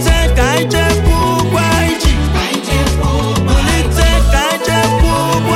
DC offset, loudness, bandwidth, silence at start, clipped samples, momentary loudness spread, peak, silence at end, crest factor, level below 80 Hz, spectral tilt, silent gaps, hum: under 0.1%; -13 LUFS; 16 kHz; 0 s; under 0.1%; 3 LU; 0 dBFS; 0 s; 10 dB; -16 dBFS; -5 dB/octave; none; none